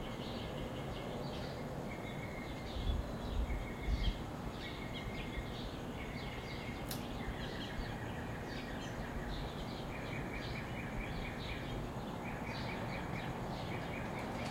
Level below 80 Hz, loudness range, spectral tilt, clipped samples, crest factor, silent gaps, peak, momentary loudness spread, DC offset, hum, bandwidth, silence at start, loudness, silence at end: -46 dBFS; 1 LU; -5.5 dB/octave; under 0.1%; 18 dB; none; -24 dBFS; 3 LU; under 0.1%; none; 16 kHz; 0 s; -43 LUFS; 0 s